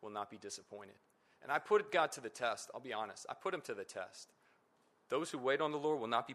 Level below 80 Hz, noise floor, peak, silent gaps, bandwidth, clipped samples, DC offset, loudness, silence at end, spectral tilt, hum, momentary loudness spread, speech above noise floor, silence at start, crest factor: -88 dBFS; -74 dBFS; -18 dBFS; none; 14 kHz; under 0.1%; under 0.1%; -39 LUFS; 0 s; -3.5 dB/octave; none; 19 LU; 35 dB; 0 s; 22 dB